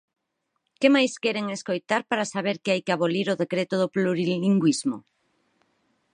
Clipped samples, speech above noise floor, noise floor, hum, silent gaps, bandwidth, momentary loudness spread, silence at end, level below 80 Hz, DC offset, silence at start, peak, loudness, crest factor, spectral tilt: under 0.1%; 54 dB; -78 dBFS; none; none; 10.5 kHz; 8 LU; 1.15 s; -76 dBFS; under 0.1%; 0.8 s; -6 dBFS; -24 LUFS; 20 dB; -5 dB/octave